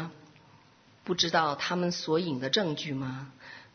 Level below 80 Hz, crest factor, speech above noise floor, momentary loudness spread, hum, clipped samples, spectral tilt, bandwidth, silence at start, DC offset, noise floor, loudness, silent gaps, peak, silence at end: -70 dBFS; 22 dB; 29 dB; 17 LU; none; under 0.1%; -4 dB/octave; 6.6 kHz; 0 s; under 0.1%; -59 dBFS; -29 LUFS; none; -10 dBFS; 0.1 s